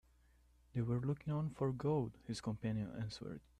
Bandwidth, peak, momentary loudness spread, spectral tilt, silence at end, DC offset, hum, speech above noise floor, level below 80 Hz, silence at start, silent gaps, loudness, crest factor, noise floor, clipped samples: 11 kHz; -26 dBFS; 8 LU; -7.5 dB/octave; 0.2 s; under 0.1%; none; 29 dB; -64 dBFS; 0.75 s; none; -41 LUFS; 14 dB; -70 dBFS; under 0.1%